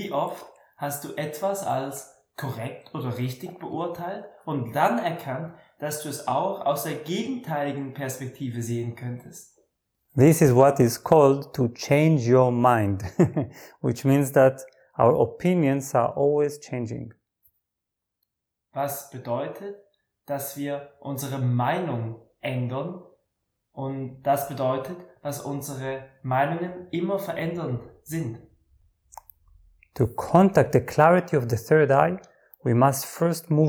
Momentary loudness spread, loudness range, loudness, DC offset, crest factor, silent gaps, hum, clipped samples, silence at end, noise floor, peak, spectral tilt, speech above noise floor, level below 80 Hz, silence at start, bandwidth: 17 LU; 11 LU; -24 LUFS; under 0.1%; 20 dB; none; none; under 0.1%; 0 s; -82 dBFS; -4 dBFS; -6.5 dB/octave; 59 dB; -60 dBFS; 0 s; over 20 kHz